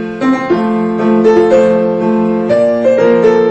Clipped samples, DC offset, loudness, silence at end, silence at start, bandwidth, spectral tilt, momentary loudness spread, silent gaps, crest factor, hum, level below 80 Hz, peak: under 0.1%; under 0.1%; -10 LUFS; 0 s; 0 s; 8.2 kHz; -7.5 dB/octave; 5 LU; none; 10 dB; none; -46 dBFS; 0 dBFS